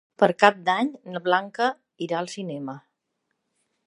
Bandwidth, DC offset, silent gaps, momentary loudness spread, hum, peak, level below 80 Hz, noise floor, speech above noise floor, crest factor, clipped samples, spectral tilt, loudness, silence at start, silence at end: 11.5 kHz; under 0.1%; none; 17 LU; none; 0 dBFS; -78 dBFS; -78 dBFS; 54 dB; 26 dB; under 0.1%; -5 dB/octave; -24 LUFS; 0.2 s; 1.05 s